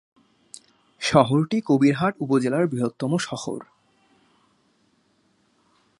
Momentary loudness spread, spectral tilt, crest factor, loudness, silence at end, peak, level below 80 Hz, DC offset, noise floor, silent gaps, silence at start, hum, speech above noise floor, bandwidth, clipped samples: 25 LU; -6 dB/octave; 24 dB; -22 LUFS; 2.35 s; -2 dBFS; -60 dBFS; under 0.1%; -65 dBFS; none; 1 s; none; 44 dB; 11.5 kHz; under 0.1%